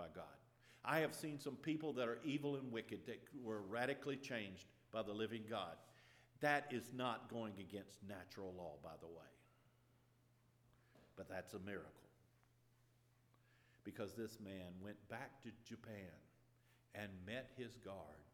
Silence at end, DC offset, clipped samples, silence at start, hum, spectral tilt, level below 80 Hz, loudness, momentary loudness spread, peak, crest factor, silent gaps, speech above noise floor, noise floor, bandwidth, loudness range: 0.05 s; under 0.1%; under 0.1%; 0 s; none; -5.5 dB/octave; -84 dBFS; -48 LUFS; 16 LU; -24 dBFS; 26 dB; none; 28 dB; -76 dBFS; 19 kHz; 12 LU